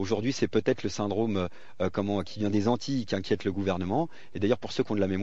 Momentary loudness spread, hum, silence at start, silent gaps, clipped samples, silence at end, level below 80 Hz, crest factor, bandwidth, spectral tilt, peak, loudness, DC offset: 4 LU; none; 0 s; none; under 0.1%; 0 s; -62 dBFS; 20 dB; 8 kHz; -6 dB/octave; -10 dBFS; -29 LUFS; 1%